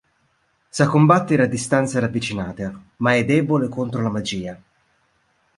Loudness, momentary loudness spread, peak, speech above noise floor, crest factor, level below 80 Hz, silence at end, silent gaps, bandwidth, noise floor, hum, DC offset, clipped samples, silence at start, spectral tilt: -20 LUFS; 15 LU; -2 dBFS; 46 dB; 18 dB; -52 dBFS; 1 s; none; 11.5 kHz; -65 dBFS; none; under 0.1%; under 0.1%; 0.75 s; -6 dB/octave